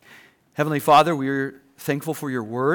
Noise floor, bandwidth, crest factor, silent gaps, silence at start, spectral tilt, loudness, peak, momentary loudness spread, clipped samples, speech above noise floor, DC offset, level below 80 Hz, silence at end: -51 dBFS; over 20 kHz; 16 dB; none; 0.6 s; -5.5 dB/octave; -22 LUFS; -6 dBFS; 15 LU; under 0.1%; 30 dB; under 0.1%; -68 dBFS; 0 s